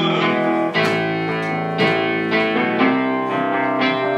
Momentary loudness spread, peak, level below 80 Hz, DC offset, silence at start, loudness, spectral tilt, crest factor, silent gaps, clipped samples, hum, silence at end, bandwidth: 4 LU; -4 dBFS; -84 dBFS; under 0.1%; 0 s; -18 LUFS; -6.5 dB/octave; 14 dB; none; under 0.1%; none; 0 s; 12.5 kHz